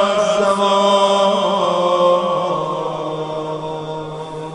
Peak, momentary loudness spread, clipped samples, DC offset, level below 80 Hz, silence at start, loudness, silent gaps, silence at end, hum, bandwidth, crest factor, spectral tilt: -2 dBFS; 13 LU; under 0.1%; under 0.1%; -56 dBFS; 0 s; -17 LUFS; none; 0 s; none; 10.5 kHz; 16 dB; -4.5 dB/octave